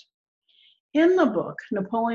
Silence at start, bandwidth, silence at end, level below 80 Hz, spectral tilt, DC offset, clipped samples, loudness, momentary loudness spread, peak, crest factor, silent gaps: 0.95 s; 7 kHz; 0 s; -68 dBFS; -7 dB/octave; under 0.1%; under 0.1%; -23 LUFS; 11 LU; -10 dBFS; 16 dB; none